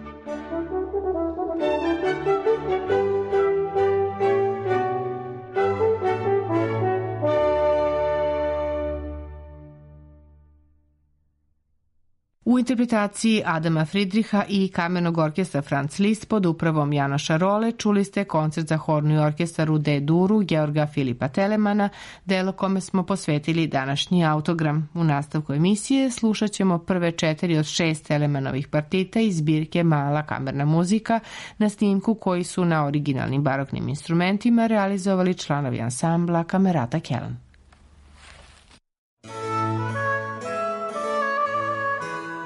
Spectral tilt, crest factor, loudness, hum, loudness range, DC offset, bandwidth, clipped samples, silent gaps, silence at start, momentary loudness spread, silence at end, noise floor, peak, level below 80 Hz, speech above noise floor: -6.5 dB/octave; 12 dB; -23 LUFS; none; 6 LU; under 0.1%; 11.5 kHz; under 0.1%; 38.98-39.17 s; 0 s; 6 LU; 0 s; -67 dBFS; -10 dBFS; -50 dBFS; 45 dB